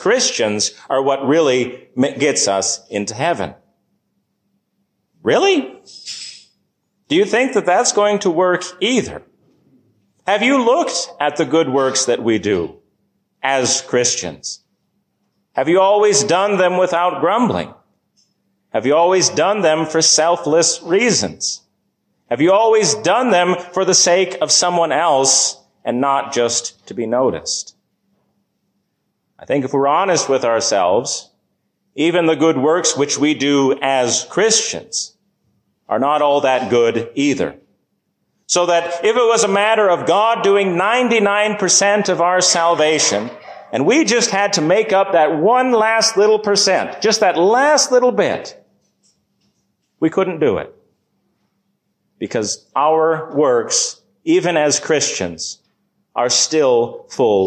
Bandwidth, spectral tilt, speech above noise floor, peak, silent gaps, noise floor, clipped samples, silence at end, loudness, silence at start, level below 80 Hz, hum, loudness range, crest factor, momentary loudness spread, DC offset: 11 kHz; -2.5 dB/octave; 54 dB; -2 dBFS; none; -70 dBFS; under 0.1%; 0 s; -15 LUFS; 0 s; -58 dBFS; none; 7 LU; 14 dB; 11 LU; under 0.1%